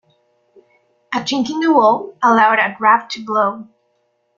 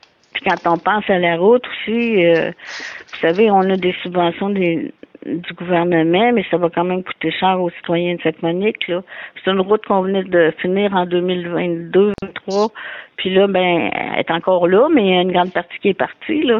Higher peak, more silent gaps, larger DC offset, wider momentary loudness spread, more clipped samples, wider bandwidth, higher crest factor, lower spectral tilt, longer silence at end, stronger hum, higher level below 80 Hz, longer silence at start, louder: about the same, -2 dBFS vs -2 dBFS; neither; neither; about the same, 9 LU vs 11 LU; neither; about the same, 7.4 kHz vs 7.2 kHz; about the same, 16 dB vs 14 dB; second, -4 dB/octave vs -7 dB/octave; first, 0.75 s vs 0 s; neither; second, -66 dBFS vs -58 dBFS; first, 1.1 s vs 0.35 s; about the same, -15 LUFS vs -17 LUFS